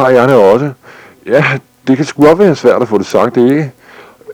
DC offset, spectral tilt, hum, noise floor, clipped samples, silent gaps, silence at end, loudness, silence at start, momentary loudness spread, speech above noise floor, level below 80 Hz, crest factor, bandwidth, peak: under 0.1%; -7 dB/octave; none; -37 dBFS; 0.3%; none; 0 s; -10 LUFS; 0 s; 10 LU; 29 dB; -48 dBFS; 10 dB; 18 kHz; 0 dBFS